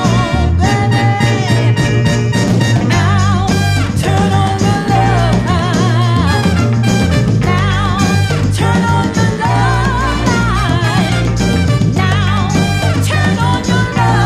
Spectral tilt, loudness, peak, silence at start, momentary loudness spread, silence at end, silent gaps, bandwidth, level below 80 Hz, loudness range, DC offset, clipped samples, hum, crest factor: -6 dB/octave; -12 LUFS; 0 dBFS; 0 s; 2 LU; 0 s; none; 13.5 kHz; -26 dBFS; 1 LU; under 0.1%; under 0.1%; none; 12 dB